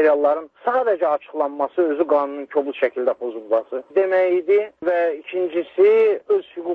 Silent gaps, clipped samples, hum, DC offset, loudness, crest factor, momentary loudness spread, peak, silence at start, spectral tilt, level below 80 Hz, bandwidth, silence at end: none; under 0.1%; none; under 0.1%; -20 LUFS; 14 dB; 7 LU; -6 dBFS; 0 s; -6.5 dB/octave; -72 dBFS; 4.7 kHz; 0 s